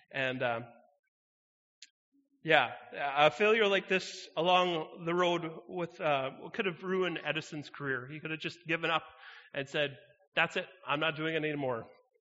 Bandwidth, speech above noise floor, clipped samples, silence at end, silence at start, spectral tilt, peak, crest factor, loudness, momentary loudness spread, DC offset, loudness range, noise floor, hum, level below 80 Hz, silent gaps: 8 kHz; over 58 dB; under 0.1%; 0.3 s; 0.15 s; -2 dB/octave; -8 dBFS; 26 dB; -32 LUFS; 13 LU; under 0.1%; 6 LU; under -90 dBFS; none; -80 dBFS; 0.99-1.82 s, 1.90-2.12 s, 10.28-10.32 s